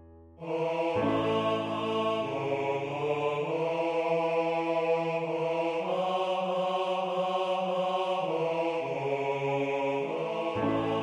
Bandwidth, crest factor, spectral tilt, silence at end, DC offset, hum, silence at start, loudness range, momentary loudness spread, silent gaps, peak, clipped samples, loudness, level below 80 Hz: 10.5 kHz; 14 dB; -6.5 dB/octave; 0 s; under 0.1%; none; 0 s; 1 LU; 3 LU; none; -16 dBFS; under 0.1%; -30 LUFS; -66 dBFS